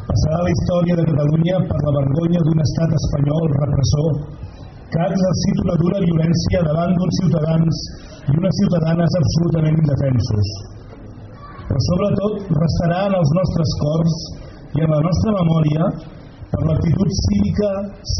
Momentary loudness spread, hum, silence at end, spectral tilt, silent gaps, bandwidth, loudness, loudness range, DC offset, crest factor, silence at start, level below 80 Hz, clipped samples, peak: 15 LU; none; 0 s; -8 dB/octave; none; 6.4 kHz; -18 LUFS; 2 LU; under 0.1%; 12 dB; 0 s; -34 dBFS; under 0.1%; -6 dBFS